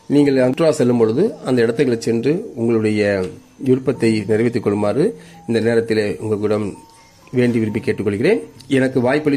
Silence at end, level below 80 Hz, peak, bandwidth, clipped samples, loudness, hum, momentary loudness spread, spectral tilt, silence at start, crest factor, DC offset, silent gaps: 0 s; -56 dBFS; -2 dBFS; 14 kHz; under 0.1%; -18 LUFS; none; 6 LU; -7 dB/octave; 0.1 s; 14 dB; under 0.1%; none